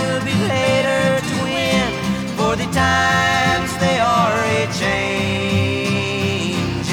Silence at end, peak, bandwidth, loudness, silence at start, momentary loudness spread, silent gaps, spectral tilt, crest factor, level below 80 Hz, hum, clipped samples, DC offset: 0 s; -4 dBFS; over 20 kHz; -17 LUFS; 0 s; 5 LU; none; -4.5 dB/octave; 14 dB; -40 dBFS; none; under 0.1%; under 0.1%